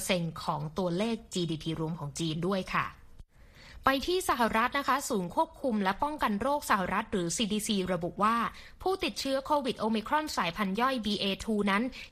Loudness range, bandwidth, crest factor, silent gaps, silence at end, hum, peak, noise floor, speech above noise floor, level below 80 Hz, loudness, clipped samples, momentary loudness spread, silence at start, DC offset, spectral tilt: 4 LU; 15 kHz; 22 dB; none; 0 s; none; -8 dBFS; -54 dBFS; 23 dB; -54 dBFS; -30 LUFS; under 0.1%; 6 LU; 0 s; under 0.1%; -4.5 dB/octave